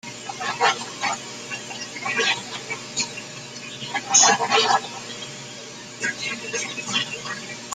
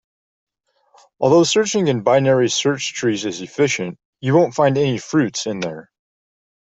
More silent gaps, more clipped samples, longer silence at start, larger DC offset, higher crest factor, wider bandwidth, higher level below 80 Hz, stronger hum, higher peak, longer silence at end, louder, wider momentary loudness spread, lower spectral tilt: second, none vs 4.05-4.13 s; neither; second, 0.05 s vs 1.2 s; neither; first, 24 dB vs 16 dB; first, 14.5 kHz vs 8.2 kHz; second, -68 dBFS vs -60 dBFS; neither; about the same, -2 dBFS vs -2 dBFS; second, 0 s vs 0.9 s; second, -23 LUFS vs -18 LUFS; first, 17 LU vs 11 LU; second, -0.5 dB/octave vs -4.5 dB/octave